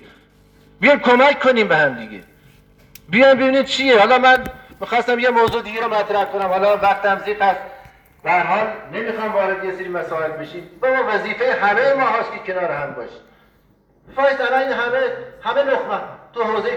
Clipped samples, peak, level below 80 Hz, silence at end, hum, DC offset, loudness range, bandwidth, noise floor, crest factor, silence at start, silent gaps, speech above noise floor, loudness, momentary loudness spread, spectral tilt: under 0.1%; 0 dBFS; -54 dBFS; 0 s; none; under 0.1%; 6 LU; 19 kHz; -56 dBFS; 18 dB; 0.8 s; none; 39 dB; -17 LUFS; 14 LU; -4.5 dB/octave